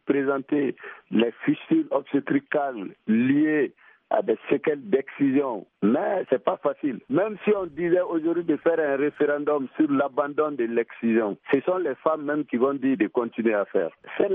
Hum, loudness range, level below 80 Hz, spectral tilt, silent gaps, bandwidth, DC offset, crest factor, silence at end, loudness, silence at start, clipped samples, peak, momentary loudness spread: none; 1 LU; -72 dBFS; -10.5 dB/octave; none; 3.8 kHz; under 0.1%; 18 dB; 0 s; -25 LUFS; 0.05 s; under 0.1%; -6 dBFS; 4 LU